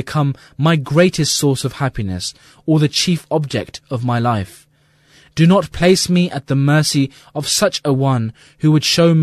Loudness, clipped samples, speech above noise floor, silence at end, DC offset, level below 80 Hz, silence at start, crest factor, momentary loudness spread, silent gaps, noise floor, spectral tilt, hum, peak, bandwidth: -16 LUFS; under 0.1%; 37 dB; 0 s; under 0.1%; -44 dBFS; 0 s; 16 dB; 11 LU; none; -53 dBFS; -5 dB/octave; none; 0 dBFS; 14 kHz